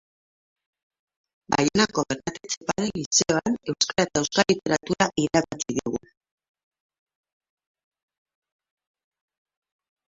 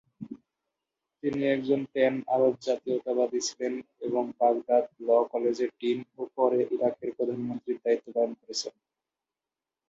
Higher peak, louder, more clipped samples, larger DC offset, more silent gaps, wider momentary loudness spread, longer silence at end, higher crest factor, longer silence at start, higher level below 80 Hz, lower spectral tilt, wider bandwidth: first, -2 dBFS vs -10 dBFS; first, -24 LUFS vs -28 LUFS; neither; neither; first, 2.57-2.61 s, 3.06-3.11 s vs none; about the same, 9 LU vs 9 LU; first, 4.1 s vs 1.2 s; first, 24 dB vs 18 dB; first, 1.5 s vs 0.2 s; first, -58 dBFS vs -74 dBFS; about the same, -3.5 dB/octave vs -4.5 dB/octave; about the same, 8 kHz vs 8 kHz